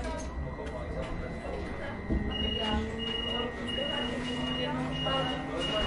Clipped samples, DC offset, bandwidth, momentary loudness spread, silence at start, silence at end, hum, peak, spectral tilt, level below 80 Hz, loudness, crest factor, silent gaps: under 0.1%; under 0.1%; 11 kHz; 8 LU; 0 s; 0 s; none; -18 dBFS; -5 dB/octave; -42 dBFS; -33 LUFS; 14 dB; none